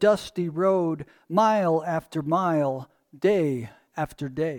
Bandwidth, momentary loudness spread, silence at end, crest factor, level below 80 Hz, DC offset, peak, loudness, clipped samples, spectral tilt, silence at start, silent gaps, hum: 18.5 kHz; 11 LU; 0 s; 16 dB; -60 dBFS; under 0.1%; -8 dBFS; -25 LUFS; under 0.1%; -7 dB/octave; 0 s; none; none